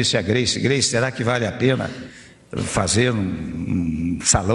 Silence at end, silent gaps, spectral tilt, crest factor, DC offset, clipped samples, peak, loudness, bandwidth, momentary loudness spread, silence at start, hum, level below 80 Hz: 0 s; none; -4 dB/octave; 18 dB; under 0.1%; under 0.1%; -4 dBFS; -20 LUFS; 11.5 kHz; 10 LU; 0 s; none; -40 dBFS